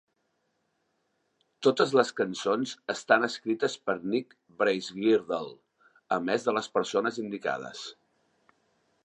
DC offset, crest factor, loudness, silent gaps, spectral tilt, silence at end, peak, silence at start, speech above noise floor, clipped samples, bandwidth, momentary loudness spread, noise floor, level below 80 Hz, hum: under 0.1%; 24 dB; -28 LUFS; none; -4.5 dB/octave; 1.15 s; -6 dBFS; 1.6 s; 48 dB; under 0.1%; 10 kHz; 11 LU; -76 dBFS; -78 dBFS; none